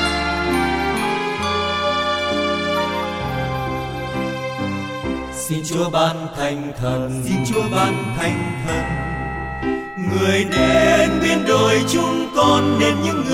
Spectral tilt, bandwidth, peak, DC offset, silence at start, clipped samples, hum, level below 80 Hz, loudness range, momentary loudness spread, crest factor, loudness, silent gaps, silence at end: -5 dB/octave; 16.5 kHz; -4 dBFS; under 0.1%; 0 s; under 0.1%; none; -38 dBFS; 6 LU; 9 LU; 16 dB; -19 LUFS; none; 0 s